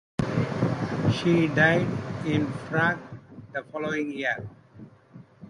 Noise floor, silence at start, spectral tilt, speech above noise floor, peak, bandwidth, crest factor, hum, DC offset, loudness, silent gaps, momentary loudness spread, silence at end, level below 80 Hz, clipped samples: -50 dBFS; 0.2 s; -7 dB/octave; 25 dB; -6 dBFS; 11 kHz; 20 dB; none; under 0.1%; -26 LUFS; none; 15 LU; 0 s; -54 dBFS; under 0.1%